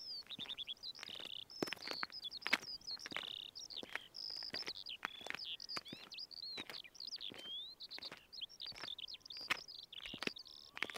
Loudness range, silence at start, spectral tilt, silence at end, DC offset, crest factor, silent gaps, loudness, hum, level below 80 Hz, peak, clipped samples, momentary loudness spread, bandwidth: 4 LU; 0 s; -1.5 dB/octave; 0 s; under 0.1%; 30 dB; none; -45 LUFS; none; -78 dBFS; -18 dBFS; under 0.1%; 7 LU; 16 kHz